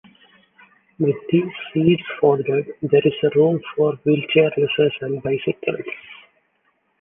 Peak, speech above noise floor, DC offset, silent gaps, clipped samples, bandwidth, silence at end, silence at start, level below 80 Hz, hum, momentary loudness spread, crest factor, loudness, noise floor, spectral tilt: -2 dBFS; 47 dB; under 0.1%; none; under 0.1%; 3.7 kHz; 0.85 s; 1 s; -60 dBFS; none; 8 LU; 18 dB; -20 LUFS; -66 dBFS; -10 dB/octave